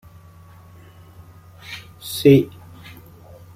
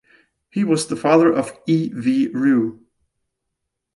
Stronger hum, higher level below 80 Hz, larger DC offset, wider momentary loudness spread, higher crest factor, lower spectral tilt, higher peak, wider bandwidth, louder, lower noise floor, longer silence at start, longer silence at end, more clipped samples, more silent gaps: neither; first, -54 dBFS vs -64 dBFS; neither; first, 28 LU vs 9 LU; about the same, 22 dB vs 18 dB; about the same, -6.5 dB/octave vs -6 dB/octave; about the same, -2 dBFS vs -2 dBFS; first, 16 kHz vs 11.5 kHz; about the same, -17 LUFS vs -19 LUFS; second, -45 dBFS vs -78 dBFS; first, 1.7 s vs 0.55 s; about the same, 1.1 s vs 1.2 s; neither; neither